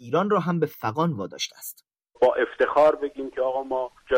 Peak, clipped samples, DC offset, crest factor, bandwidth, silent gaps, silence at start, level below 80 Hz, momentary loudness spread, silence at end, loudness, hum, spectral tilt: -10 dBFS; under 0.1%; under 0.1%; 14 dB; 16 kHz; none; 0 s; -62 dBFS; 11 LU; 0 s; -24 LUFS; none; -5.5 dB/octave